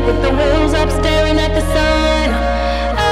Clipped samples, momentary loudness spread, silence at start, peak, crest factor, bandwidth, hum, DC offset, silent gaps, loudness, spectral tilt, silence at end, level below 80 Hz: under 0.1%; 3 LU; 0 s; 0 dBFS; 14 dB; 13.5 kHz; none; under 0.1%; none; -14 LUFS; -5.5 dB/octave; 0 s; -20 dBFS